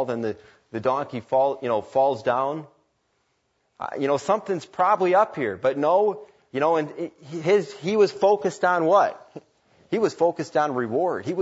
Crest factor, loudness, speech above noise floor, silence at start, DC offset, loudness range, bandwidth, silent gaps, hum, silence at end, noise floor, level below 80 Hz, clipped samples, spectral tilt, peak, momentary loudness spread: 18 dB; -23 LUFS; 48 dB; 0 s; under 0.1%; 3 LU; 8 kHz; none; none; 0 s; -71 dBFS; -70 dBFS; under 0.1%; -6 dB/octave; -6 dBFS; 13 LU